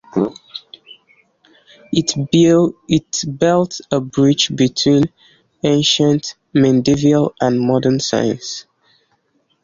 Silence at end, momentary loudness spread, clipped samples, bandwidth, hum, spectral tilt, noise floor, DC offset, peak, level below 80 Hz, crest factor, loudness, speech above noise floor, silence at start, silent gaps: 1 s; 9 LU; under 0.1%; 7.6 kHz; none; -5 dB/octave; -63 dBFS; under 0.1%; -2 dBFS; -50 dBFS; 14 dB; -16 LUFS; 48 dB; 0.15 s; none